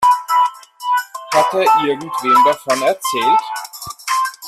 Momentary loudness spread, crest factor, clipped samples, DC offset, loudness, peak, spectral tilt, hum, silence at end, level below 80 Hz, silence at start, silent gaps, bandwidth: 14 LU; 14 dB; under 0.1%; under 0.1%; -15 LUFS; -2 dBFS; -2.5 dB/octave; none; 0 s; -62 dBFS; 0 s; none; 14.5 kHz